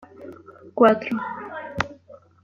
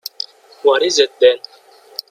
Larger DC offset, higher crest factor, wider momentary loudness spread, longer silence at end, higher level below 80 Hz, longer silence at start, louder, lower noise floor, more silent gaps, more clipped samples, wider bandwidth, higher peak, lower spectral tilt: neither; about the same, 22 dB vs 18 dB; first, 24 LU vs 17 LU; second, 0.3 s vs 0.75 s; first, -56 dBFS vs -64 dBFS; second, 0 s vs 0.65 s; second, -23 LUFS vs -14 LUFS; first, -49 dBFS vs -35 dBFS; neither; neither; second, 7.4 kHz vs 16 kHz; about the same, -2 dBFS vs 0 dBFS; first, -6.5 dB/octave vs -0.5 dB/octave